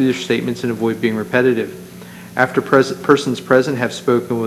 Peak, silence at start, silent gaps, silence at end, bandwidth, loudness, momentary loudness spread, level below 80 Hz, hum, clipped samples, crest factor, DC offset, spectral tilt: 0 dBFS; 0 s; none; 0 s; 13.5 kHz; -17 LUFS; 11 LU; -60 dBFS; none; under 0.1%; 16 dB; under 0.1%; -5.5 dB/octave